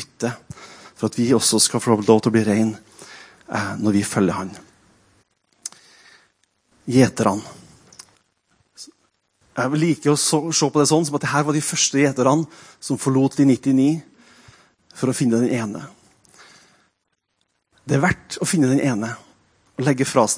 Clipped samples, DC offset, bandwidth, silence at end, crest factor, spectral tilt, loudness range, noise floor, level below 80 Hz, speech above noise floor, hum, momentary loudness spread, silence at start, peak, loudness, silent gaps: under 0.1%; under 0.1%; 10.5 kHz; 0 s; 20 dB; -4.5 dB/octave; 7 LU; -73 dBFS; -58 dBFS; 55 dB; none; 21 LU; 0 s; 0 dBFS; -19 LUFS; none